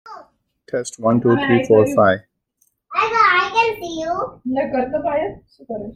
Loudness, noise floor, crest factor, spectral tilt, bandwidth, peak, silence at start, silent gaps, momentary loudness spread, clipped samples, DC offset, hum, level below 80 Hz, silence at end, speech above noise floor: -18 LUFS; -65 dBFS; 16 dB; -5.5 dB/octave; 15.5 kHz; -2 dBFS; 0.05 s; none; 12 LU; under 0.1%; under 0.1%; none; -52 dBFS; 0 s; 47 dB